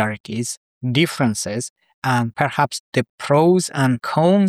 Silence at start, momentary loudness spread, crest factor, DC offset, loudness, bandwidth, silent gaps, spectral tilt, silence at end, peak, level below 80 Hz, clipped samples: 0 s; 10 LU; 16 dB; under 0.1%; -20 LUFS; 15 kHz; 0.20-0.24 s, 0.57-0.81 s, 1.70-1.76 s, 1.94-2.02 s, 2.80-2.92 s, 3.09-3.18 s; -5.5 dB/octave; 0 s; -4 dBFS; -60 dBFS; under 0.1%